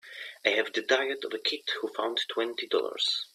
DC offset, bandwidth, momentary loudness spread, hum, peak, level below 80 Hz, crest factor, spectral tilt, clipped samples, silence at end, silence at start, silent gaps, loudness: under 0.1%; 14.5 kHz; 5 LU; none; -8 dBFS; -82 dBFS; 22 dB; -1 dB/octave; under 0.1%; 0.1 s; 0.05 s; none; -29 LUFS